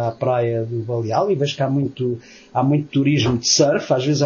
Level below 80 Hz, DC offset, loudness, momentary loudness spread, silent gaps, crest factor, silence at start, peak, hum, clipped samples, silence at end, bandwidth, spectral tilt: -52 dBFS; under 0.1%; -19 LUFS; 9 LU; none; 16 dB; 0 s; -4 dBFS; none; under 0.1%; 0 s; 7.2 kHz; -5 dB/octave